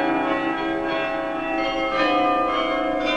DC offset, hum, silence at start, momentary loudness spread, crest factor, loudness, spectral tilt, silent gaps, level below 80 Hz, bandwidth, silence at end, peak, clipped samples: 0.2%; none; 0 s; 5 LU; 14 dB; -22 LUFS; -5 dB/octave; none; -46 dBFS; 9.6 kHz; 0 s; -8 dBFS; under 0.1%